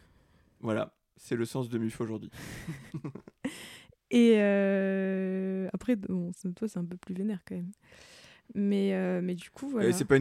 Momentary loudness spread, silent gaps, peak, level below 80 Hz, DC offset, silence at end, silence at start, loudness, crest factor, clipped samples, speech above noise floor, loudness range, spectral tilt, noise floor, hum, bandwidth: 17 LU; none; -10 dBFS; -64 dBFS; under 0.1%; 0 s; 0.65 s; -31 LUFS; 20 dB; under 0.1%; 34 dB; 8 LU; -6.5 dB/octave; -64 dBFS; none; 15 kHz